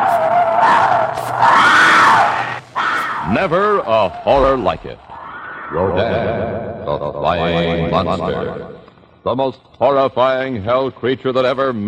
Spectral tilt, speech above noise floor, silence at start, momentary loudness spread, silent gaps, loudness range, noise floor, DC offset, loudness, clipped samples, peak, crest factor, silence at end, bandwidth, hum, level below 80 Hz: -5 dB/octave; 26 dB; 0 s; 14 LU; none; 7 LU; -42 dBFS; under 0.1%; -15 LUFS; under 0.1%; -2 dBFS; 14 dB; 0 s; 16 kHz; none; -40 dBFS